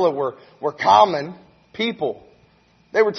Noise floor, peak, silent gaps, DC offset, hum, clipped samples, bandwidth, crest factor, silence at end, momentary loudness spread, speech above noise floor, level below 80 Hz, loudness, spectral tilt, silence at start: -56 dBFS; -2 dBFS; none; under 0.1%; none; under 0.1%; 6.4 kHz; 20 dB; 0 s; 19 LU; 37 dB; -64 dBFS; -20 LUFS; -5 dB/octave; 0 s